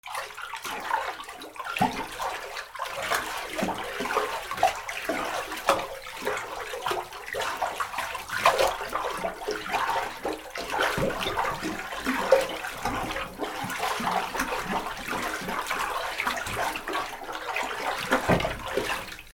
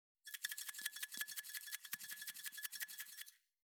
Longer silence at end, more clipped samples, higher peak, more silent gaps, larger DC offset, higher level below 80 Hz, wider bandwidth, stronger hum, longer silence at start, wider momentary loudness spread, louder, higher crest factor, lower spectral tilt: second, 0.05 s vs 0.4 s; neither; first, -4 dBFS vs -24 dBFS; neither; neither; first, -50 dBFS vs under -90 dBFS; about the same, over 20 kHz vs over 20 kHz; neither; second, 0.05 s vs 0.25 s; first, 9 LU vs 6 LU; first, -29 LUFS vs -47 LUFS; about the same, 24 dB vs 26 dB; first, -3 dB/octave vs 3.5 dB/octave